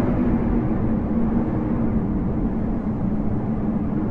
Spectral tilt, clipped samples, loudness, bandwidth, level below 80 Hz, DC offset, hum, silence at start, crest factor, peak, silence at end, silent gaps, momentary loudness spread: -11.5 dB/octave; under 0.1%; -23 LUFS; 3.6 kHz; -30 dBFS; under 0.1%; none; 0 s; 12 dB; -8 dBFS; 0 s; none; 3 LU